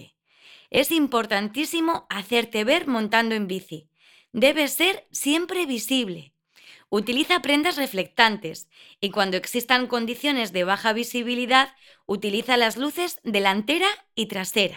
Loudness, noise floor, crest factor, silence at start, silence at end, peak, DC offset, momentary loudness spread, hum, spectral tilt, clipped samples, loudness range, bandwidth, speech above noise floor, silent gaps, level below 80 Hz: -23 LUFS; -54 dBFS; 24 dB; 0 s; 0 s; 0 dBFS; under 0.1%; 9 LU; none; -3 dB/octave; under 0.1%; 2 LU; 20 kHz; 30 dB; none; -66 dBFS